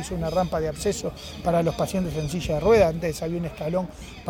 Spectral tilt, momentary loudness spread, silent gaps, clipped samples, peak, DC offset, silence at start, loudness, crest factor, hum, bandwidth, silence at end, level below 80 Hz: -6 dB/octave; 10 LU; none; under 0.1%; -8 dBFS; under 0.1%; 0 s; -25 LUFS; 18 dB; none; 18 kHz; 0 s; -40 dBFS